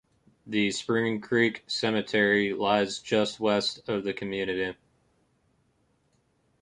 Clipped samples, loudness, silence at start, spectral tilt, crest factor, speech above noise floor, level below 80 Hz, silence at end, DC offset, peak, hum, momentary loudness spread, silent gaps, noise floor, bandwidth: under 0.1%; -27 LUFS; 0.45 s; -4.5 dB/octave; 20 dB; 43 dB; -66 dBFS; 1.9 s; under 0.1%; -10 dBFS; none; 7 LU; none; -70 dBFS; 11 kHz